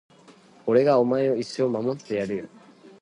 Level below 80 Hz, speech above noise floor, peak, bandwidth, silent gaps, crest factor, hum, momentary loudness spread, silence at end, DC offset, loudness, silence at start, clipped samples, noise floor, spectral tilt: -68 dBFS; 30 dB; -6 dBFS; 10.5 kHz; none; 18 dB; none; 14 LU; 0.1 s; under 0.1%; -24 LUFS; 0.65 s; under 0.1%; -52 dBFS; -7 dB/octave